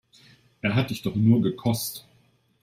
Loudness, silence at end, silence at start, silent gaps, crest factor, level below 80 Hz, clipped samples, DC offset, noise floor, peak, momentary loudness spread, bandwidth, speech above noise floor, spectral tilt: -25 LUFS; 0.6 s; 0.65 s; none; 18 dB; -60 dBFS; under 0.1%; under 0.1%; -63 dBFS; -8 dBFS; 10 LU; 16 kHz; 40 dB; -6 dB/octave